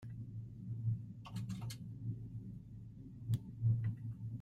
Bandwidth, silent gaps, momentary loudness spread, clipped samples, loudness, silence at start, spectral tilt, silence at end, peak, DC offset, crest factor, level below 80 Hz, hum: 12.5 kHz; none; 14 LU; under 0.1%; -43 LUFS; 0 s; -7.5 dB/octave; 0 s; -24 dBFS; under 0.1%; 18 dB; -62 dBFS; none